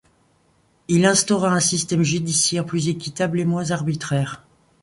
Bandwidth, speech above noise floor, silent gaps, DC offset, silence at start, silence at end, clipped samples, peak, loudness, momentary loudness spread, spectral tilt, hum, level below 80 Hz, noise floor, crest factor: 11.5 kHz; 41 dB; none; under 0.1%; 0.9 s; 0.45 s; under 0.1%; -2 dBFS; -20 LUFS; 8 LU; -4 dB/octave; none; -56 dBFS; -61 dBFS; 18 dB